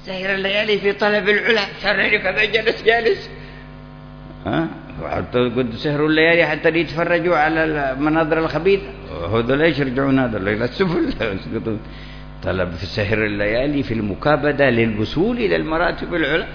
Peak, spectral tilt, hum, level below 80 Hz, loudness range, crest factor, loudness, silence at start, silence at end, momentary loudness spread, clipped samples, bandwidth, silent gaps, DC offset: -2 dBFS; -7 dB/octave; none; -38 dBFS; 5 LU; 16 dB; -18 LUFS; 0 s; 0 s; 13 LU; under 0.1%; 5.4 kHz; none; under 0.1%